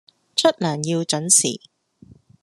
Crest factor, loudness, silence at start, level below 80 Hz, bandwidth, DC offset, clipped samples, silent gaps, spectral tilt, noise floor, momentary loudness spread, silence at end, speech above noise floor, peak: 22 dB; -19 LUFS; 0.35 s; -68 dBFS; 13 kHz; under 0.1%; under 0.1%; none; -3 dB/octave; -50 dBFS; 10 LU; 0.85 s; 30 dB; 0 dBFS